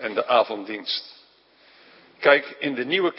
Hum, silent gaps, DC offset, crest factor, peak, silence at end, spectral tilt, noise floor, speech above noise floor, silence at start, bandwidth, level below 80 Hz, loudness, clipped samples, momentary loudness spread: none; none; under 0.1%; 22 dB; -2 dBFS; 0 s; -8 dB/octave; -56 dBFS; 34 dB; 0 s; 5.8 kHz; -80 dBFS; -22 LUFS; under 0.1%; 10 LU